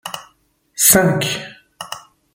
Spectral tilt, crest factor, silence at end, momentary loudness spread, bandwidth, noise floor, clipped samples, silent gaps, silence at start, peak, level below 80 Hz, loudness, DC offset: -3 dB/octave; 20 dB; 0.35 s; 24 LU; 17 kHz; -59 dBFS; under 0.1%; none; 0.05 s; 0 dBFS; -50 dBFS; -14 LUFS; under 0.1%